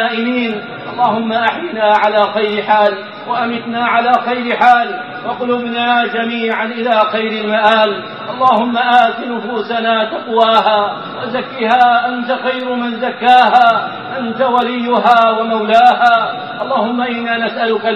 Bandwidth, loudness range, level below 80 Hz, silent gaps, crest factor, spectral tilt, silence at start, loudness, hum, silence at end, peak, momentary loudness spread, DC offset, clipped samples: 7.6 kHz; 2 LU; -60 dBFS; none; 14 dB; -5.5 dB/octave; 0 s; -13 LUFS; none; 0 s; 0 dBFS; 11 LU; 0.1%; under 0.1%